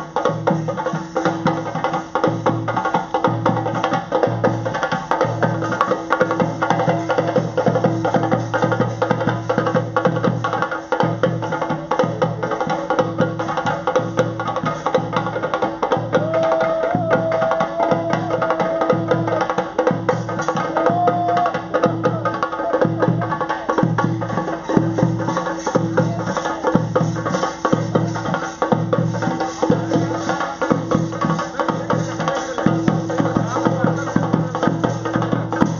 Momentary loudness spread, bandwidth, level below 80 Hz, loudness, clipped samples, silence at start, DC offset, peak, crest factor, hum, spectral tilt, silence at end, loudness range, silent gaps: 4 LU; 7.4 kHz; -50 dBFS; -20 LUFS; under 0.1%; 0 s; under 0.1%; 0 dBFS; 20 dB; none; -6 dB/octave; 0 s; 2 LU; none